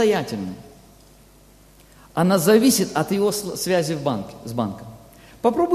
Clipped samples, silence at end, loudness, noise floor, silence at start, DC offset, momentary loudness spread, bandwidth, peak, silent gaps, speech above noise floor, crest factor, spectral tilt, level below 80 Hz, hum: under 0.1%; 0 s; -21 LUFS; -50 dBFS; 0 s; under 0.1%; 15 LU; 14.5 kHz; -4 dBFS; none; 30 dB; 18 dB; -5 dB/octave; -54 dBFS; 50 Hz at -50 dBFS